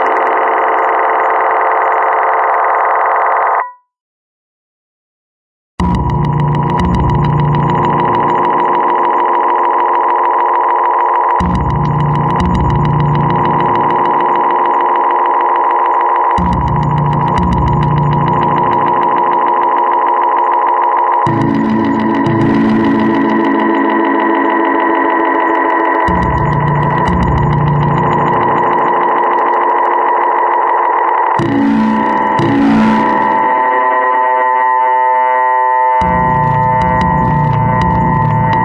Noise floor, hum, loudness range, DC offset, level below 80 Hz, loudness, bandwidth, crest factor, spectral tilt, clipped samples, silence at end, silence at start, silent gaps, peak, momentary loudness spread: under -90 dBFS; none; 2 LU; under 0.1%; -30 dBFS; -11 LUFS; 8 kHz; 12 dB; -8.5 dB/octave; under 0.1%; 0 s; 0 s; 4.00-5.78 s; 0 dBFS; 2 LU